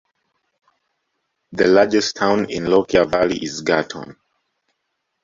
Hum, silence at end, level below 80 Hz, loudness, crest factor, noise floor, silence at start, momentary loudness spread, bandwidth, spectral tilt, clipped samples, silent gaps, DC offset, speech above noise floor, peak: none; 1.1 s; -52 dBFS; -17 LUFS; 18 dB; -75 dBFS; 1.5 s; 17 LU; 7.8 kHz; -4.5 dB/octave; under 0.1%; none; under 0.1%; 57 dB; -2 dBFS